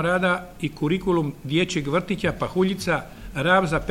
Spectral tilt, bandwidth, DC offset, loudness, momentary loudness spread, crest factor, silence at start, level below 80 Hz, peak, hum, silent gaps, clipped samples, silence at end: -5.5 dB/octave; 16.5 kHz; under 0.1%; -23 LUFS; 7 LU; 18 dB; 0 s; -44 dBFS; -6 dBFS; none; none; under 0.1%; 0 s